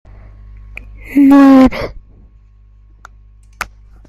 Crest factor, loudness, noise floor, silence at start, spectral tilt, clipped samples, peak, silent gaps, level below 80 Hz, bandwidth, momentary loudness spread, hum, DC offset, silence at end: 14 dB; -8 LUFS; -43 dBFS; 1.1 s; -6.5 dB/octave; under 0.1%; 0 dBFS; none; -34 dBFS; 12.5 kHz; 28 LU; 50 Hz at -40 dBFS; under 0.1%; 0.45 s